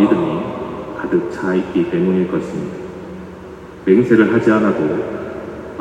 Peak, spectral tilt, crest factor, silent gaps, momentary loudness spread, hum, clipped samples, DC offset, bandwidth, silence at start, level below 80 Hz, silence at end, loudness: 0 dBFS; -8 dB/octave; 16 dB; none; 19 LU; none; under 0.1%; under 0.1%; 9 kHz; 0 s; -48 dBFS; 0 s; -17 LUFS